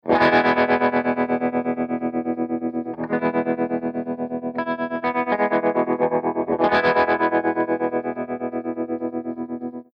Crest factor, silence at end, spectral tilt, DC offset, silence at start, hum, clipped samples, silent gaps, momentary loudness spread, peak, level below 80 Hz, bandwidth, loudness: 16 dB; 0.15 s; -7.5 dB/octave; under 0.1%; 0.05 s; none; under 0.1%; none; 10 LU; -6 dBFS; -60 dBFS; 6 kHz; -22 LUFS